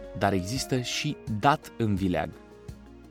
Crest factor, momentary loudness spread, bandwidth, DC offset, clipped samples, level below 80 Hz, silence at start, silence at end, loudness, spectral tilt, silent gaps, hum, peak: 22 dB; 21 LU; 17 kHz; under 0.1%; under 0.1%; -50 dBFS; 0 s; 0 s; -28 LUFS; -5 dB/octave; none; none; -6 dBFS